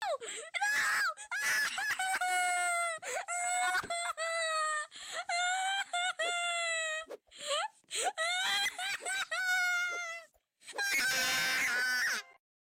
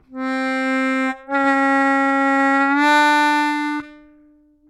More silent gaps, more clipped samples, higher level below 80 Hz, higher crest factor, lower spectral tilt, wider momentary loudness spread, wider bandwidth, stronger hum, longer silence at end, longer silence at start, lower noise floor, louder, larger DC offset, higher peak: neither; neither; second, -78 dBFS vs -64 dBFS; about the same, 12 dB vs 14 dB; second, 1.5 dB/octave vs -2.5 dB/octave; about the same, 9 LU vs 9 LU; first, 16.5 kHz vs 13 kHz; neither; second, 0.3 s vs 0.75 s; about the same, 0 s vs 0.1 s; first, -58 dBFS vs -53 dBFS; second, -32 LUFS vs -17 LUFS; neither; second, -22 dBFS vs -4 dBFS